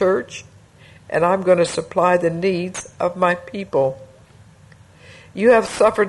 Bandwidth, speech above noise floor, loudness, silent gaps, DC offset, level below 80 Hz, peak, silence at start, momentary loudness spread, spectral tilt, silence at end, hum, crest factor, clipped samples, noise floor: 11.5 kHz; 29 dB; -19 LUFS; none; under 0.1%; -56 dBFS; -2 dBFS; 0 s; 13 LU; -5.5 dB/octave; 0 s; none; 16 dB; under 0.1%; -47 dBFS